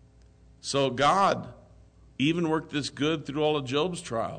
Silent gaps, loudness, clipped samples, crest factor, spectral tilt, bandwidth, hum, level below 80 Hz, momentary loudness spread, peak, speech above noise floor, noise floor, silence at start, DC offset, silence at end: none; -27 LUFS; under 0.1%; 16 dB; -5 dB/octave; 9.4 kHz; none; -58 dBFS; 10 LU; -12 dBFS; 29 dB; -56 dBFS; 0.65 s; under 0.1%; 0 s